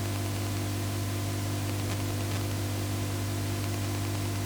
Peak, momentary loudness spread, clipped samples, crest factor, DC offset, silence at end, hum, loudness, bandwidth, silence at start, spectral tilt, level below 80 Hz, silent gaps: -16 dBFS; 0 LU; under 0.1%; 14 dB; under 0.1%; 0 s; 50 Hz at -35 dBFS; -32 LUFS; over 20 kHz; 0 s; -5 dB/octave; -48 dBFS; none